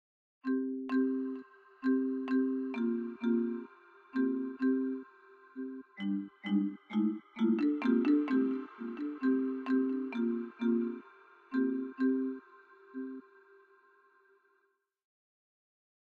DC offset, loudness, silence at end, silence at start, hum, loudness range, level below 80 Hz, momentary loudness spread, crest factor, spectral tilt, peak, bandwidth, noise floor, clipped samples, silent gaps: under 0.1%; -34 LUFS; 3 s; 0.45 s; none; 8 LU; -90 dBFS; 14 LU; 16 dB; -8.5 dB/octave; -18 dBFS; 4.7 kHz; -77 dBFS; under 0.1%; none